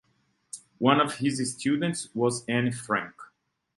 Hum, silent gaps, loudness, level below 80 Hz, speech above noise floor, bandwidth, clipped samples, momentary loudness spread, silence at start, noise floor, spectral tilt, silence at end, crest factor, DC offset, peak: none; none; -27 LUFS; -68 dBFS; 44 dB; 11.5 kHz; under 0.1%; 19 LU; 0.55 s; -71 dBFS; -4.5 dB/octave; 0.5 s; 22 dB; under 0.1%; -6 dBFS